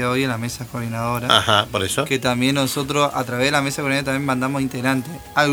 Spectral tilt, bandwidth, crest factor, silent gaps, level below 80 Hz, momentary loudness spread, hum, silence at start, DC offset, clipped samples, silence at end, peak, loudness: -4 dB/octave; over 20 kHz; 20 dB; none; -48 dBFS; 8 LU; none; 0 s; under 0.1%; under 0.1%; 0 s; 0 dBFS; -20 LUFS